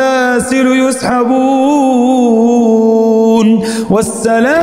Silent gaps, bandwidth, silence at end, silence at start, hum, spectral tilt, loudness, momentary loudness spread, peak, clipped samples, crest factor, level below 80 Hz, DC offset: none; 15 kHz; 0 s; 0 s; none; -5 dB/octave; -10 LUFS; 4 LU; 0 dBFS; under 0.1%; 8 dB; -46 dBFS; under 0.1%